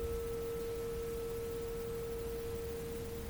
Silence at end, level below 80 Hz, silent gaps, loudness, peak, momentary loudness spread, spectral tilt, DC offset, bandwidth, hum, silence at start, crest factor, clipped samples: 0 s; -50 dBFS; none; -41 LUFS; -28 dBFS; 2 LU; -5.5 dB/octave; under 0.1%; over 20 kHz; none; 0 s; 12 dB; under 0.1%